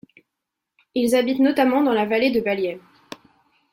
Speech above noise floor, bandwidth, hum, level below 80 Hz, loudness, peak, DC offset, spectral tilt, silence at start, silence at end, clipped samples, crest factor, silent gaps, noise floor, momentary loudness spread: 63 dB; 16.5 kHz; none; -62 dBFS; -20 LUFS; -6 dBFS; under 0.1%; -5 dB/octave; 0.95 s; 0.95 s; under 0.1%; 16 dB; none; -82 dBFS; 23 LU